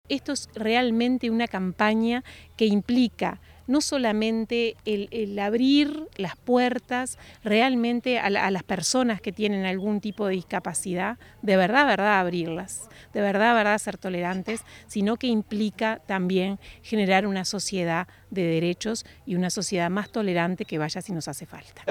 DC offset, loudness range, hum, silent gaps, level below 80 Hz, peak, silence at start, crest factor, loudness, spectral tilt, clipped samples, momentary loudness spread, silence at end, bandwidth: under 0.1%; 3 LU; none; none; -58 dBFS; -4 dBFS; 0.1 s; 20 dB; -25 LUFS; -4.5 dB/octave; under 0.1%; 11 LU; 0 s; 15.5 kHz